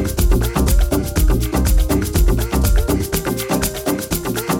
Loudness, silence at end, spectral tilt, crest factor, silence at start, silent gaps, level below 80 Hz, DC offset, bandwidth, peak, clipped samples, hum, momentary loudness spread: -18 LUFS; 0 s; -5 dB/octave; 12 dB; 0 s; none; -18 dBFS; under 0.1%; 17.5 kHz; -4 dBFS; under 0.1%; none; 4 LU